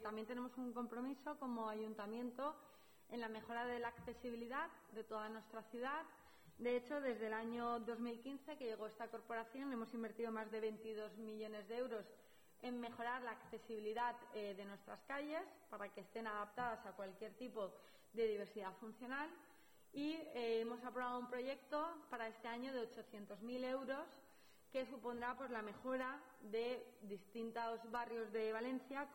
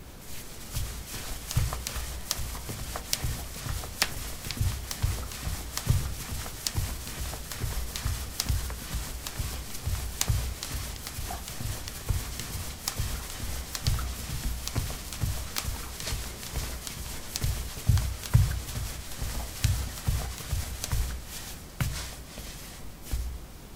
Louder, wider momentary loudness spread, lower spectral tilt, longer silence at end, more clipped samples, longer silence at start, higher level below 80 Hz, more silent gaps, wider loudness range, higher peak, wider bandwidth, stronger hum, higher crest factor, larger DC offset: second, -48 LUFS vs -33 LUFS; about the same, 10 LU vs 8 LU; first, -5 dB/octave vs -3.5 dB/octave; about the same, 0 s vs 0 s; neither; about the same, 0 s vs 0 s; second, -82 dBFS vs -36 dBFS; neither; about the same, 3 LU vs 4 LU; second, -32 dBFS vs -2 dBFS; about the same, 18 kHz vs 18 kHz; neither; second, 16 dB vs 30 dB; neither